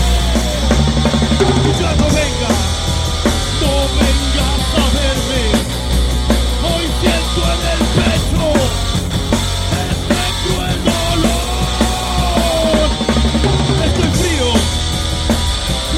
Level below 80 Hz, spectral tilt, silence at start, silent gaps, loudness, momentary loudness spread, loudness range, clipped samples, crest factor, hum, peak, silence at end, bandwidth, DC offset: -18 dBFS; -4.5 dB/octave; 0 s; none; -15 LUFS; 3 LU; 1 LU; under 0.1%; 14 dB; none; 0 dBFS; 0 s; 16 kHz; under 0.1%